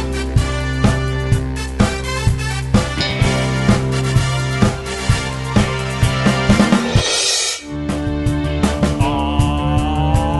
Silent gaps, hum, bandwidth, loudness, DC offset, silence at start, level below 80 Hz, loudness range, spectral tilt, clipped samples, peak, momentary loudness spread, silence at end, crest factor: none; none; 12 kHz; -17 LUFS; under 0.1%; 0 s; -24 dBFS; 2 LU; -5 dB/octave; under 0.1%; 0 dBFS; 5 LU; 0 s; 16 dB